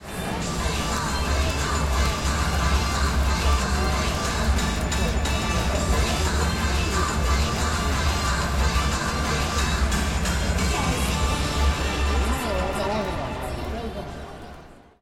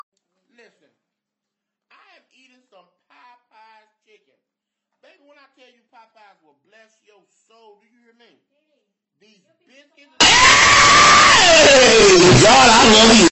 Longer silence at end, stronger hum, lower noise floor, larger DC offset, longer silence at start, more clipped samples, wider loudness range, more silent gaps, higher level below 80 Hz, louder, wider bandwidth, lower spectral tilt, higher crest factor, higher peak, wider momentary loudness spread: first, 0.2 s vs 0 s; neither; second, -45 dBFS vs -83 dBFS; neither; second, 0 s vs 10.2 s; neither; second, 2 LU vs 8 LU; neither; first, -26 dBFS vs -42 dBFS; second, -24 LUFS vs -9 LUFS; first, 16 kHz vs 8.6 kHz; first, -4 dB/octave vs -2.5 dB/octave; about the same, 14 dB vs 16 dB; second, -10 dBFS vs 0 dBFS; first, 6 LU vs 1 LU